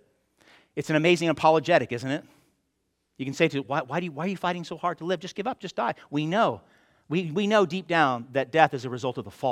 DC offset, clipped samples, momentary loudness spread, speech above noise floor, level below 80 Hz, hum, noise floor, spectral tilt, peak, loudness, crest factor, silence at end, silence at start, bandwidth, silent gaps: under 0.1%; under 0.1%; 11 LU; 50 dB; -70 dBFS; none; -76 dBFS; -5.5 dB/octave; -2 dBFS; -26 LUFS; 24 dB; 0 s; 0.75 s; 14.5 kHz; none